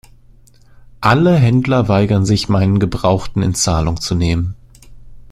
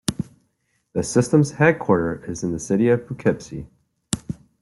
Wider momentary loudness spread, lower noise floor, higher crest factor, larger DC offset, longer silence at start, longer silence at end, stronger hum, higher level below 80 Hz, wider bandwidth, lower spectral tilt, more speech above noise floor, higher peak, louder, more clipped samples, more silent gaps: second, 7 LU vs 16 LU; second, -45 dBFS vs -70 dBFS; second, 16 dB vs 22 dB; neither; first, 1 s vs 0.1 s; second, 0.1 s vs 0.3 s; neither; first, -34 dBFS vs -50 dBFS; first, 14 kHz vs 12.5 kHz; about the same, -6 dB/octave vs -6 dB/octave; second, 31 dB vs 50 dB; about the same, 0 dBFS vs 0 dBFS; first, -15 LUFS vs -21 LUFS; neither; neither